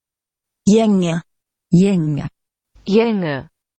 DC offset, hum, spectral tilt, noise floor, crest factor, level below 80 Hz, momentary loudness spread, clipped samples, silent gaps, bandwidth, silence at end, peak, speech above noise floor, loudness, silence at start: under 0.1%; none; -7 dB/octave; -86 dBFS; 16 dB; -50 dBFS; 13 LU; under 0.1%; none; 8.8 kHz; 0.35 s; -2 dBFS; 71 dB; -17 LUFS; 0.65 s